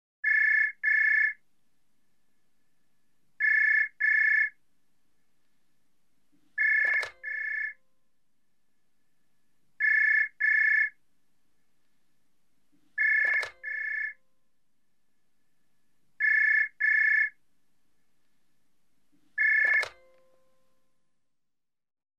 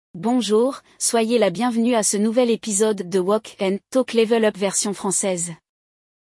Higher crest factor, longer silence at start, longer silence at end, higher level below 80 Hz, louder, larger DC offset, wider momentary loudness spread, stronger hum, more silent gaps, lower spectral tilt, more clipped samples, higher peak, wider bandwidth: about the same, 14 dB vs 14 dB; about the same, 0.25 s vs 0.15 s; first, 2.3 s vs 0.85 s; second, -84 dBFS vs -70 dBFS; second, -24 LUFS vs -20 LUFS; neither; first, 12 LU vs 5 LU; neither; neither; second, 0 dB/octave vs -3.5 dB/octave; neither; second, -16 dBFS vs -6 dBFS; second, 9.4 kHz vs 12 kHz